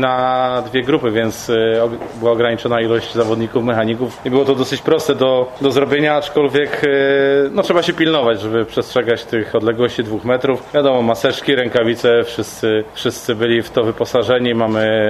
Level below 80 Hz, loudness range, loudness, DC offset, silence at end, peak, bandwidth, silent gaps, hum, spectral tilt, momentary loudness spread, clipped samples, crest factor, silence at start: -50 dBFS; 2 LU; -16 LUFS; under 0.1%; 0 s; -2 dBFS; 13.5 kHz; none; none; -5.5 dB/octave; 4 LU; under 0.1%; 14 dB; 0 s